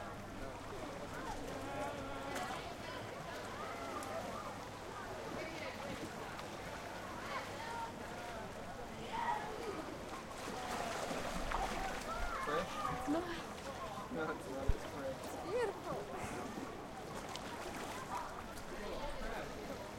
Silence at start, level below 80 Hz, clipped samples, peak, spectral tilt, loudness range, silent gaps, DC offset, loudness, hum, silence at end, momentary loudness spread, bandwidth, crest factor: 0 s; -54 dBFS; under 0.1%; -18 dBFS; -4.5 dB/octave; 4 LU; none; under 0.1%; -44 LUFS; none; 0 s; 7 LU; 16 kHz; 24 dB